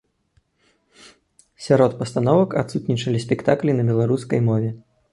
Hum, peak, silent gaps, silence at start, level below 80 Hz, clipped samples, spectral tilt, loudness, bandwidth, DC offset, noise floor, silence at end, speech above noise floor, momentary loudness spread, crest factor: none; -2 dBFS; none; 1.6 s; -56 dBFS; under 0.1%; -7.5 dB/octave; -20 LUFS; 11.5 kHz; under 0.1%; -64 dBFS; 0.35 s; 45 dB; 6 LU; 18 dB